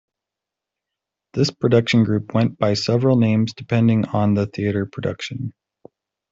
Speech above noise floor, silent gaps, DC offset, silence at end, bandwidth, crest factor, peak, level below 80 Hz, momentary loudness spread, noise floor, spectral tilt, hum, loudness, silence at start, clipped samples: 67 dB; none; under 0.1%; 0.8 s; 7.8 kHz; 16 dB; -4 dBFS; -54 dBFS; 11 LU; -86 dBFS; -7 dB/octave; none; -19 LUFS; 1.35 s; under 0.1%